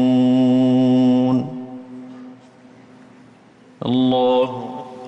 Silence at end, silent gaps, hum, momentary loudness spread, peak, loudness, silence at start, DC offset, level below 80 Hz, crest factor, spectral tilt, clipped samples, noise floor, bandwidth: 0 s; none; none; 21 LU; -8 dBFS; -17 LUFS; 0 s; under 0.1%; -62 dBFS; 10 dB; -8.5 dB/octave; under 0.1%; -48 dBFS; 7.8 kHz